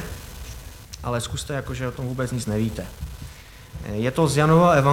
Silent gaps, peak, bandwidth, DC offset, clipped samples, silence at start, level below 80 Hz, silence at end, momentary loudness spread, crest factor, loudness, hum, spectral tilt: none; -4 dBFS; 17 kHz; under 0.1%; under 0.1%; 0 s; -40 dBFS; 0 s; 23 LU; 18 dB; -23 LUFS; none; -6 dB/octave